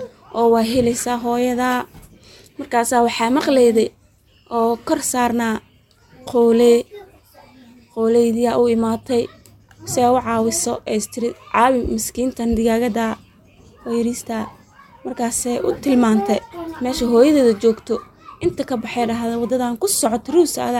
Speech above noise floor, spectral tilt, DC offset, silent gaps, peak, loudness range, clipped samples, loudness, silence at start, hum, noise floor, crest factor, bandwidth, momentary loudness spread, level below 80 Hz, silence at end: 36 dB; -4 dB/octave; under 0.1%; none; -2 dBFS; 3 LU; under 0.1%; -18 LUFS; 0 s; none; -54 dBFS; 16 dB; 17 kHz; 12 LU; -46 dBFS; 0 s